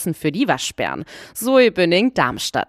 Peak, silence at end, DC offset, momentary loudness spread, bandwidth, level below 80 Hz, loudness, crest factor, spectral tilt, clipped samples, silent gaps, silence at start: -2 dBFS; 0.05 s; under 0.1%; 11 LU; 15.5 kHz; -54 dBFS; -18 LUFS; 18 dB; -4 dB/octave; under 0.1%; none; 0 s